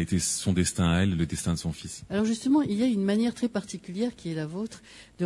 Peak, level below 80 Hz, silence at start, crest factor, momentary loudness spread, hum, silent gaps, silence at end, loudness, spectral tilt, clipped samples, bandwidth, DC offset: -12 dBFS; -52 dBFS; 0 s; 16 dB; 11 LU; none; none; 0 s; -27 LUFS; -5 dB/octave; under 0.1%; 12 kHz; under 0.1%